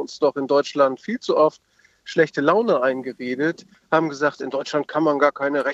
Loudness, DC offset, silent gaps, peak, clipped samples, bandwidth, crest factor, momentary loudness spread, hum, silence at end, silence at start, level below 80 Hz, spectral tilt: -21 LUFS; under 0.1%; none; -2 dBFS; under 0.1%; 8 kHz; 18 dB; 8 LU; none; 0 s; 0 s; -74 dBFS; -5.5 dB/octave